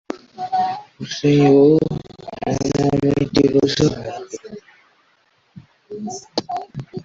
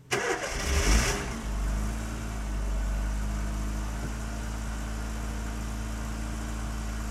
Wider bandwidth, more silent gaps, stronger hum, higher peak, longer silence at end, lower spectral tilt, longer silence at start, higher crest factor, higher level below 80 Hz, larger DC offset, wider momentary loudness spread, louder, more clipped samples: second, 7.8 kHz vs 14 kHz; neither; neither; first, -2 dBFS vs -10 dBFS; about the same, 0 s vs 0 s; first, -6.5 dB/octave vs -4 dB/octave; about the same, 0.1 s vs 0 s; about the same, 16 dB vs 20 dB; second, -48 dBFS vs -32 dBFS; neither; first, 20 LU vs 9 LU; first, -18 LUFS vs -32 LUFS; neither